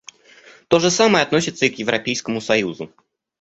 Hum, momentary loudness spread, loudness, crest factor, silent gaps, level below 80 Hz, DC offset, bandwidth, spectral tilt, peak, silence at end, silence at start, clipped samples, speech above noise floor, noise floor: none; 11 LU; -18 LUFS; 18 dB; none; -58 dBFS; under 0.1%; 8.2 kHz; -3.5 dB/octave; -2 dBFS; 0.55 s; 0.7 s; under 0.1%; 29 dB; -48 dBFS